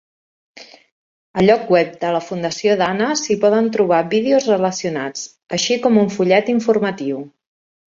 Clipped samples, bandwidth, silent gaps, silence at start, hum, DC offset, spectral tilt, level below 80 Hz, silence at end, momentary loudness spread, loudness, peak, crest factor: under 0.1%; 7.6 kHz; 0.92-1.34 s; 0.55 s; none; under 0.1%; -4.5 dB/octave; -58 dBFS; 0.65 s; 10 LU; -17 LUFS; -2 dBFS; 16 dB